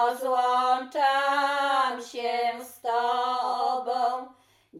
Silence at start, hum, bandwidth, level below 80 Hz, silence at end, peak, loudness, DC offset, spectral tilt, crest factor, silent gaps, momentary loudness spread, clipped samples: 0 s; none; 16 kHz; -80 dBFS; 0 s; -12 dBFS; -26 LUFS; under 0.1%; -1 dB/octave; 14 dB; none; 7 LU; under 0.1%